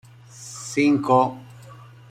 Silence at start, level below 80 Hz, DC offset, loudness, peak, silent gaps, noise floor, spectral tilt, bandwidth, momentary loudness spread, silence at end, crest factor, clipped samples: 0.35 s; -64 dBFS; under 0.1%; -20 LUFS; -4 dBFS; none; -44 dBFS; -5.5 dB/octave; 14 kHz; 22 LU; 0.35 s; 18 dB; under 0.1%